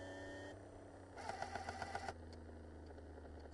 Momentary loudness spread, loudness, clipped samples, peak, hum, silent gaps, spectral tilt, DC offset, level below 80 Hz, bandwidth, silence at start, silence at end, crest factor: 9 LU; -51 LUFS; under 0.1%; -28 dBFS; none; none; -5 dB/octave; under 0.1%; -64 dBFS; 11.5 kHz; 0 s; 0 s; 22 dB